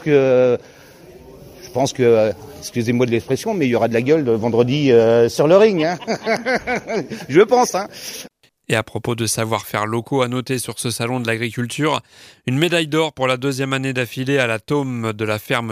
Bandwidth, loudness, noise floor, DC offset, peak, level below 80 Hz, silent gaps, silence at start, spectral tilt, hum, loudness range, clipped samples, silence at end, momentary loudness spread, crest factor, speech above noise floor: 16 kHz; -18 LUFS; -42 dBFS; under 0.1%; 0 dBFS; -56 dBFS; none; 0 s; -5 dB/octave; none; 6 LU; under 0.1%; 0 s; 10 LU; 18 dB; 24 dB